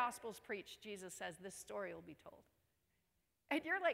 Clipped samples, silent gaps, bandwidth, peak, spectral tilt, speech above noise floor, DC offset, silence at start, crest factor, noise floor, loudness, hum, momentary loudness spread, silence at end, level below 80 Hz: under 0.1%; none; 16 kHz; -24 dBFS; -3 dB/octave; 39 dB; under 0.1%; 0 s; 22 dB; -85 dBFS; -46 LUFS; none; 16 LU; 0 s; -82 dBFS